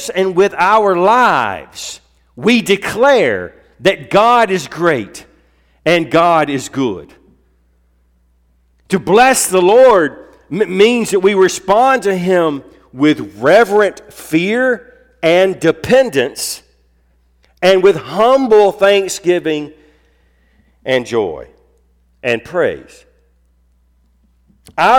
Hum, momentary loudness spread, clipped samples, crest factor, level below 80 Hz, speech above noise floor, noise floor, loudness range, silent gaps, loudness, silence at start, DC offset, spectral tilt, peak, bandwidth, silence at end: none; 13 LU; under 0.1%; 12 dB; -50 dBFS; 43 dB; -55 dBFS; 9 LU; none; -13 LUFS; 0 s; under 0.1%; -4 dB/octave; -2 dBFS; 18 kHz; 0 s